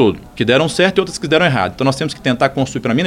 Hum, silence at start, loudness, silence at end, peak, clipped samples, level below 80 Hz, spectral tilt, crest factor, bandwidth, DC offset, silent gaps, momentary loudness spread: none; 0 s; -15 LUFS; 0 s; 0 dBFS; under 0.1%; -44 dBFS; -5 dB/octave; 14 dB; 15.5 kHz; under 0.1%; none; 6 LU